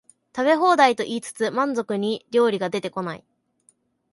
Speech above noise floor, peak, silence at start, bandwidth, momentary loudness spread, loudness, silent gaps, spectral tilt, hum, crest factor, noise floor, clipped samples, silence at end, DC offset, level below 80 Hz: 42 dB; -4 dBFS; 0.35 s; 11.5 kHz; 13 LU; -22 LUFS; none; -4.5 dB/octave; none; 18 dB; -63 dBFS; under 0.1%; 0.95 s; under 0.1%; -72 dBFS